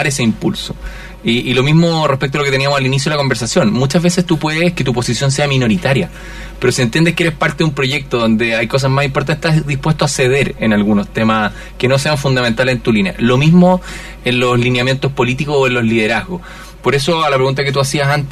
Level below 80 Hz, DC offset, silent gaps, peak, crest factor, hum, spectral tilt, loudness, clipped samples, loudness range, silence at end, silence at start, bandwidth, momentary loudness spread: -36 dBFS; under 0.1%; none; 0 dBFS; 14 dB; none; -5.5 dB/octave; -14 LUFS; under 0.1%; 2 LU; 0 s; 0 s; 14 kHz; 6 LU